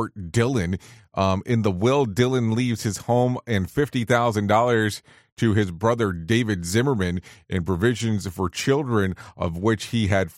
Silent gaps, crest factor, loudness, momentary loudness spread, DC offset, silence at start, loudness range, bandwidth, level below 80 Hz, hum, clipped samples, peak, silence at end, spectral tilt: 5.32-5.37 s; 16 dB; -23 LUFS; 7 LU; under 0.1%; 0 s; 2 LU; 16 kHz; -48 dBFS; none; under 0.1%; -6 dBFS; 0.05 s; -6 dB/octave